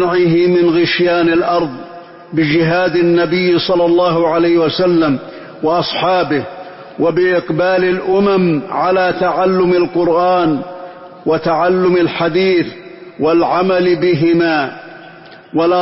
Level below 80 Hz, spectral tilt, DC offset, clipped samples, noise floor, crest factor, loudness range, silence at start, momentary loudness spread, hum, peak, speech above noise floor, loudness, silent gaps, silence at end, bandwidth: -50 dBFS; -9.5 dB/octave; under 0.1%; under 0.1%; -37 dBFS; 10 dB; 2 LU; 0 s; 11 LU; none; -4 dBFS; 24 dB; -13 LUFS; none; 0 s; 5.8 kHz